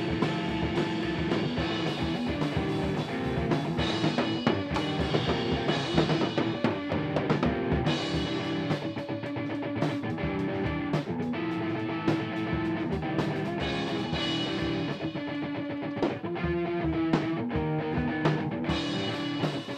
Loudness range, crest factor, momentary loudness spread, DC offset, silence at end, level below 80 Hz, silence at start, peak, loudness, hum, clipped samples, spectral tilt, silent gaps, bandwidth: 3 LU; 18 dB; 4 LU; under 0.1%; 0 s; -46 dBFS; 0 s; -10 dBFS; -30 LUFS; none; under 0.1%; -6.5 dB/octave; none; 10 kHz